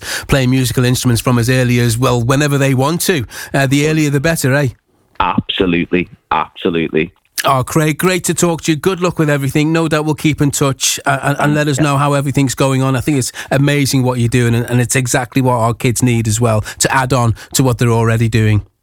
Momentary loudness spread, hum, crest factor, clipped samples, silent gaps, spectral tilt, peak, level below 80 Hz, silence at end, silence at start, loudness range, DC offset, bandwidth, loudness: 4 LU; none; 14 dB; under 0.1%; none; -5 dB/octave; 0 dBFS; -38 dBFS; 0.2 s; 0 s; 2 LU; under 0.1%; 19 kHz; -14 LUFS